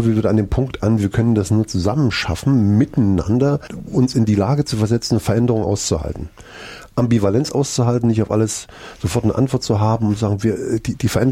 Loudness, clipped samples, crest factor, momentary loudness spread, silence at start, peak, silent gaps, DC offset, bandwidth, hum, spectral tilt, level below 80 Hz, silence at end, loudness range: -18 LUFS; under 0.1%; 14 dB; 7 LU; 0 s; -4 dBFS; none; under 0.1%; 15 kHz; none; -6.5 dB/octave; -38 dBFS; 0 s; 2 LU